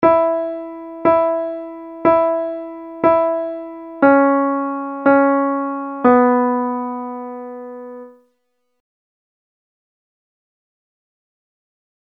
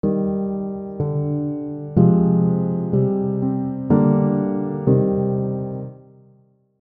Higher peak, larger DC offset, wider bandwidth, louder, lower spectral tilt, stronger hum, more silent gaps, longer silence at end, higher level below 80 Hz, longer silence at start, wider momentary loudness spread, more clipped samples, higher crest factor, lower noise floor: about the same, 0 dBFS vs -2 dBFS; neither; first, 4.5 kHz vs 2.4 kHz; first, -17 LUFS vs -20 LUFS; second, -9.5 dB/octave vs -14.5 dB/octave; neither; neither; first, 3.95 s vs 0.9 s; second, -60 dBFS vs -50 dBFS; about the same, 0 s vs 0.05 s; first, 18 LU vs 11 LU; neither; about the same, 18 dB vs 18 dB; first, -71 dBFS vs -56 dBFS